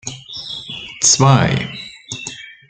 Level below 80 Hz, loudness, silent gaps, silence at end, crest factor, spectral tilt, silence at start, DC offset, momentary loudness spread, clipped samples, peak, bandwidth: -48 dBFS; -14 LUFS; none; 0.15 s; 18 dB; -3.5 dB/octave; 0.05 s; under 0.1%; 18 LU; under 0.1%; 0 dBFS; 9.4 kHz